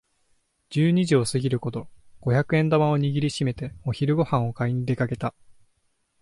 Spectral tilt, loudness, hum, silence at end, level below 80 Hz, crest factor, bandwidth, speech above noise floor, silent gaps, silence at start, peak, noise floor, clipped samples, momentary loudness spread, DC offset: -7 dB/octave; -24 LUFS; none; 0.9 s; -54 dBFS; 16 dB; 11.5 kHz; 47 dB; none; 0.7 s; -8 dBFS; -70 dBFS; under 0.1%; 10 LU; under 0.1%